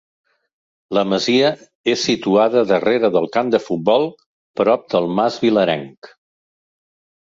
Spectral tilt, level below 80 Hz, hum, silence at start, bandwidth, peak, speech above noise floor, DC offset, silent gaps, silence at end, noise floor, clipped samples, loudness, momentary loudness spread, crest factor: -5 dB/octave; -62 dBFS; none; 0.9 s; 7.8 kHz; -2 dBFS; over 73 dB; under 0.1%; 1.75-1.84 s, 4.26-4.54 s, 5.97-6.02 s; 1.15 s; under -90 dBFS; under 0.1%; -17 LUFS; 7 LU; 16 dB